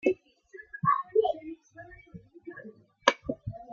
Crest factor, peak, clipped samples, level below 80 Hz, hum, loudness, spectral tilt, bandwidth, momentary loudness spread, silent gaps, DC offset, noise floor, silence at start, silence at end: 30 dB; -2 dBFS; under 0.1%; -62 dBFS; none; -29 LUFS; -4.5 dB/octave; 7.2 kHz; 23 LU; none; under 0.1%; -52 dBFS; 0.05 s; 0 s